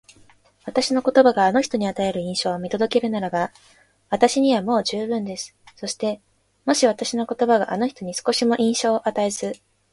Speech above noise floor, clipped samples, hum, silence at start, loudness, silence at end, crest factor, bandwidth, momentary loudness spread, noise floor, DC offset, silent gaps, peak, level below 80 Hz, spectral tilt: 33 dB; under 0.1%; none; 0.65 s; -21 LUFS; 0.35 s; 20 dB; 11.5 kHz; 13 LU; -54 dBFS; under 0.1%; none; -2 dBFS; -62 dBFS; -4 dB/octave